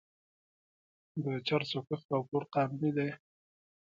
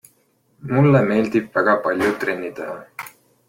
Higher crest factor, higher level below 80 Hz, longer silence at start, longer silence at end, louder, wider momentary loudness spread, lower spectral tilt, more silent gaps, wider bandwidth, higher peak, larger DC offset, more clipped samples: about the same, 20 dB vs 16 dB; second, -78 dBFS vs -58 dBFS; first, 1.15 s vs 0.65 s; first, 0.7 s vs 0.4 s; second, -34 LUFS vs -19 LUFS; second, 7 LU vs 20 LU; about the same, -7.5 dB/octave vs -8 dB/octave; first, 2.05-2.09 s vs none; second, 7.4 kHz vs 16.5 kHz; second, -18 dBFS vs -4 dBFS; neither; neither